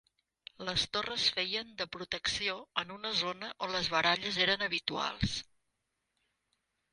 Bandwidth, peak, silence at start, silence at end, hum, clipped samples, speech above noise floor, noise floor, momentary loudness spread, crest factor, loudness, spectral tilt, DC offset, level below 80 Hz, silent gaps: 11.5 kHz; -12 dBFS; 0.6 s; 1.5 s; none; under 0.1%; 49 dB; -83 dBFS; 9 LU; 22 dB; -33 LUFS; -2.5 dB/octave; under 0.1%; -58 dBFS; none